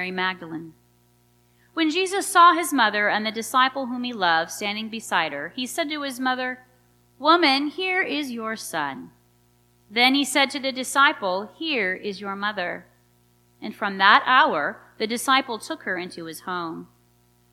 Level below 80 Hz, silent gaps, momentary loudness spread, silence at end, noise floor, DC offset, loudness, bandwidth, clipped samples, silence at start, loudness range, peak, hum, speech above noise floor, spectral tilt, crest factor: -70 dBFS; none; 15 LU; 0.65 s; -61 dBFS; under 0.1%; -22 LUFS; 16 kHz; under 0.1%; 0 s; 4 LU; 0 dBFS; 60 Hz at -60 dBFS; 38 dB; -2.5 dB/octave; 22 dB